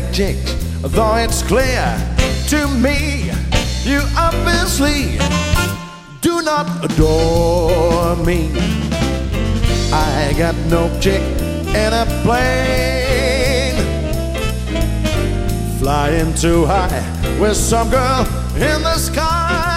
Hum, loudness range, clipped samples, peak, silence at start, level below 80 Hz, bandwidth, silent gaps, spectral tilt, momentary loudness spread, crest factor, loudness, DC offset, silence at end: none; 1 LU; under 0.1%; 0 dBFS; 0 s; -20 dBFS; 16 kHz; none; -5 dB/octave; 6 LU; 14 dB; -16 LUFS; under 0.1%; 0 s